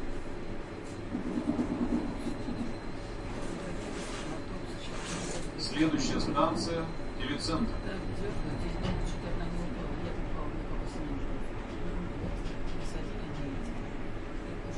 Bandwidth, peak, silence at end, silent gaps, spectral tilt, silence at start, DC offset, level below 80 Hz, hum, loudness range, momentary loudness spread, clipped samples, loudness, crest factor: 11 kHz; -14 dBFS; 0 s; none; -5.5 dB/octave; 0 s; under 0.1%; -40 dBFS; none; 6 LU; 10 LU; under 0.1%; -36 LUFS; 18 dB